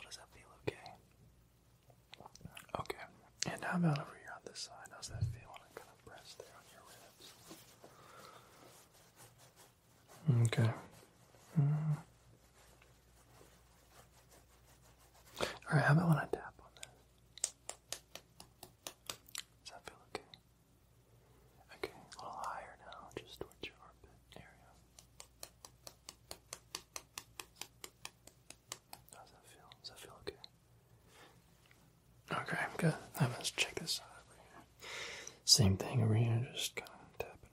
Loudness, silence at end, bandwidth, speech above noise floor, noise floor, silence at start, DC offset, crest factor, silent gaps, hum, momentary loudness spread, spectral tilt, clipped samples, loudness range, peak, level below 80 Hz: -38 LUFS; 0.15 s; 16 kHz; 36 dB; -69 dBFS; 0 s; under 0.1%; 30 dB; none; none; 25 LU; -4 dB/octave; under 0.1%; 19 LU; -12 dBFS; -68 dBFS